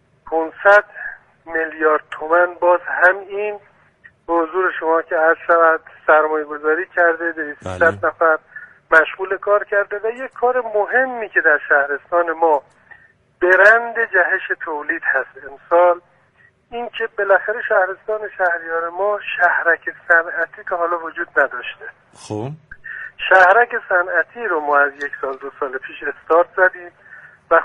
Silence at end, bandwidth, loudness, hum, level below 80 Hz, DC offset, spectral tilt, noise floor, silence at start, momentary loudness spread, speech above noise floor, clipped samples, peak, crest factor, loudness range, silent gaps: 0 s; 10 kHz; -17 LUFS; none; -60 dBFS; under 0.1%; -5.5 dB/octave; -55 dBFS; 0.25 s; 14 LU; 37 dB; under 0.1%; 0 dBFS; 18 dB; 4 LU; none